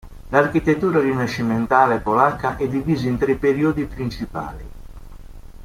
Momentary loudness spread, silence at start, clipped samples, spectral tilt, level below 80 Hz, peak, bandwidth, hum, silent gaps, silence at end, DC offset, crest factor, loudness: 12 LU; 0.05 s; under 0.1%; -7.5 dB/octave; -40 dBFS; -2 dBFS; 16 kHz; none; none; 0 s; under 0.1%; 18 dB; -19 LUFS